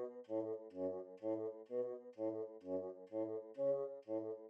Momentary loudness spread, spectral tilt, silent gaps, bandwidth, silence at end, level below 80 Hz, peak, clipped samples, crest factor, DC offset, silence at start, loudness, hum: 6 LU; -9 dB/octave; none; 5.4 kHz; 0 s; under -90 dBFS; -30 dBFS; under 0.1%; 14 dB; under 0.1%; 0 s; -44 LUFS; none